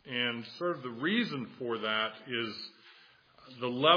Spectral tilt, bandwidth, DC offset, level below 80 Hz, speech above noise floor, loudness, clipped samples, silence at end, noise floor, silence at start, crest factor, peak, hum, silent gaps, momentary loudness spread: -6 dB/octave; 5.2 kHz; under 0.1%; -84 dBFS; 28 dB; -34 LUFS; under 0.1%; 0 s; -60 dBFS; 0.05 s; 24 dB; -10 dBFS; none; none; 9 LU